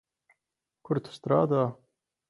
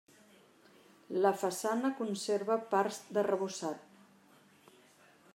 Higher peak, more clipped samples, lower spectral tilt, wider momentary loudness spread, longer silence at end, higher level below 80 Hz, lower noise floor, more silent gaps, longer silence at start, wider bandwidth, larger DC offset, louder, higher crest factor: first, -10 dBFS vs -14 dBFS; neither; first, -9 dB/octave vs -4.5 dB/octave; about the same, 8 LU vs 9 LU; second, 0.55 s vs 1.55 s; first, -70 dBFS vs under -90 dBFS; first, -86 dBFS vs -63 dBFS; neither; second, 0.9 s vs 1.1 s; second, 11.5 kHz vs 16 kHz; neither; first, -28 LUFS vs -34 LUFS; about the same, 20 dB vs 22 dB